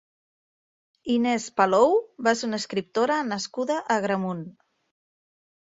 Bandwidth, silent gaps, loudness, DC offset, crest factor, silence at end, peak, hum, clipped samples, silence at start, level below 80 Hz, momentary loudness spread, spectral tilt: 7.8 kHz; none; -24 LUFS; under 0.1%; 20 dB; 1.25 s; -6 dBFS; none; under 0.1%; 1.05 s; -70 dBFS; 10 LU; -4.5 dB/octave